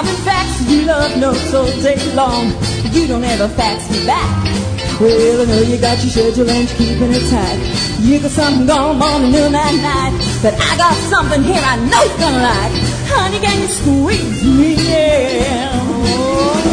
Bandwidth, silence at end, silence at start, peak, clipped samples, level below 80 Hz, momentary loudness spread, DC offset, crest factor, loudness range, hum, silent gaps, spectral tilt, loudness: 10 kHz; 0 s; 0 s; 0 dBFS; under 0.1%; -26 dBFS; 4 LU; under 0.1%; 12 dB; 2 LU; none; none; -5 dB/octave; -13 LUFS